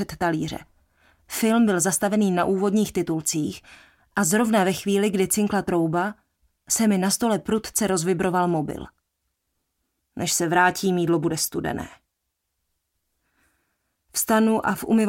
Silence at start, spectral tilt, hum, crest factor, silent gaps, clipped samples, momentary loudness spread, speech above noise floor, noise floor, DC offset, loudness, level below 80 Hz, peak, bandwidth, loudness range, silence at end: 0 s; -4.5 dB/octave; none; 18 dB; none; under 0.1%; 11 LU; 56 dB; -79 dBFS; under 0.1%; -22 LUFS; -56 dBFS; -6 dBFS; 17 kHz; 5 LU; 0 s